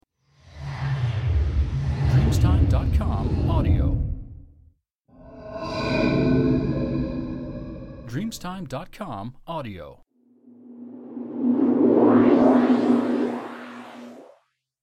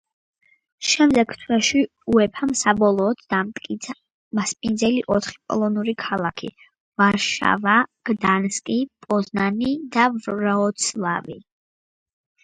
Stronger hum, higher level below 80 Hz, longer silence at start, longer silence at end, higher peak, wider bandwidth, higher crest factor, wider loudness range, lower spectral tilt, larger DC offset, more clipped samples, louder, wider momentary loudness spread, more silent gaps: neither; first, -32 dBFS vs -56 dBFS; second, 0.55 s vs 0.8 s; second, 0.6 s vs 1.05 s; second, -6 dBFS vs -2 dBFS; first, 12.5 kHz vs 9.6 kHz; about the same, 16 dB vs 20 dB; first, 13 LU vs 4 LU; first, -8 dB/octave vs -4 dB/octave; neither; neither; about the same, -22 LUFS vs -21 LUFS; first, 21 LU vs 11 LU; second, 4.95-4.99 s vs 4.11-4.31 s, 6.80-6.92 s